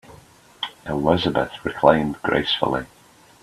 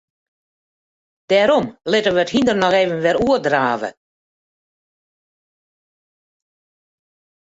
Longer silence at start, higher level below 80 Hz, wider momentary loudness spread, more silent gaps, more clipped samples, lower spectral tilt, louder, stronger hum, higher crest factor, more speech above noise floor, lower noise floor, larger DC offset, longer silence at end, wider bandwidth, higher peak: second, 0.1 s vs 1.3 s; first, -48 dBFS vs -54 dBFS; first, 14 LU vs 5 LU; neither; neither; about the same, -6 dB/octave vs -5 dB/octave; second, -21 LUFS vs -17 LUFS; neither; about the same, 22 dB vs 18 dB; second, 28 dB vs over 74 dB; second, -49 dBFS vs under -90 dBFS; neither; second, 0.55 s vs 3.5 s; first, 13.5 kHz vs 8 kHz; about the same, 0 dBFS vs -2 dBFS